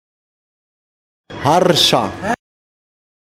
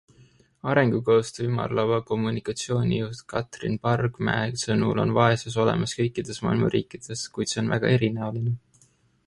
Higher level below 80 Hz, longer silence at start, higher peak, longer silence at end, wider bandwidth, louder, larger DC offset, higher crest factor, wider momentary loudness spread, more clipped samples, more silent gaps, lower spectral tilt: about the same, -50 dBFS vs -54 dBFS; first, 1.3 s vs 0.65 s; first, 0 dBFS vs -6 dBFS; first, 0.95 s vs 0.7 s; first, 16.5 kHz vs 11.5 kHz; first, -15 LUFS vs -25 LUFS; neither; about the same, 20 dB vs 20 dB; first, 12 LU vs 9 LU; neither; neither; second, -4 dB/octave vs -6 dB/octave